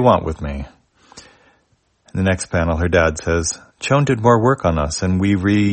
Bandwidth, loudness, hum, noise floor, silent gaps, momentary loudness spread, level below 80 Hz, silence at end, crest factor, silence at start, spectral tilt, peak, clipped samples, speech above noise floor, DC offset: 8.8 kHz; -18 LUFS; none; -62 dBFS; none; 12 LU; -36 dBFS; 0 s; 18 dB; 0 s; -5.5 dB/octave; 0 dBFS; under 0.1%; 45 dB; under 0.1%